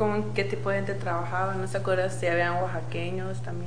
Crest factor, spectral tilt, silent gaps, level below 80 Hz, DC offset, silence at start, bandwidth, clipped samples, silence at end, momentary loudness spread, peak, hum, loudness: 16 dB; -6.5 dB/octave; none; -58 dBFS; 2%; 0 s; 10 kHz; under 0.1%; 0 s; 6 LU; -10 dBFS; none; -28 LUFS